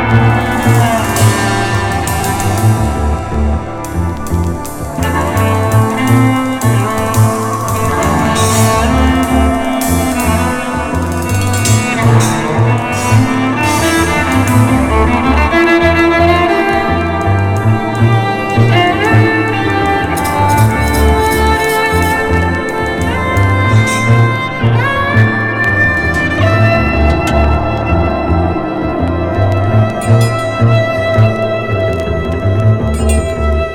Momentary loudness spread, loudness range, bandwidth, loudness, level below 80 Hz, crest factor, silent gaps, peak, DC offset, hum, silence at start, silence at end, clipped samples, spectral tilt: 5 LU; 3 LU; 17 kHz; -12 LUFS; -22 dBFS; 10 dB; none; 0 dBFS; under 0.1%; none; 0 s; 0 s; under 0.1%; -5.5 dB/octave